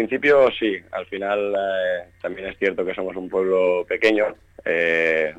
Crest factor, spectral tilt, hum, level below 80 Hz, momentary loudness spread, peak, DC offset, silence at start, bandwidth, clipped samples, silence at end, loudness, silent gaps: 14 dB; -5.5 dB/octave; none; -58 dBFS; 12 LU; -6 dBFS; under 0.1%; 0 s; 9 kHz; under 0.1%; 0 s; -21 LUFS; none